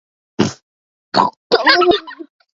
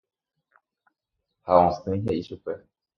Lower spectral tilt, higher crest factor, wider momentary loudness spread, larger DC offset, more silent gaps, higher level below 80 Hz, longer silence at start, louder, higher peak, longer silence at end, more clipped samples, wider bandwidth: second, -4.5 dB/octave vs -8.5 dB/octave; second, 18 dB vs 24 dB; second, 14 LU vs 18 LU; neither; first, 0.63-1.12 s, 1.37-1.50 s vs none; about the same, -52 dBFS vs -50 dBFS; second, 0.4 s vs 1.45 s; first, -15 LUFS vs -24 LUFS; first, 0 dBFS vs -4 dBFS; about the same, 0.3 s vs 0.4 s; neither; first, 7.8 kHz vs 6.8 kHz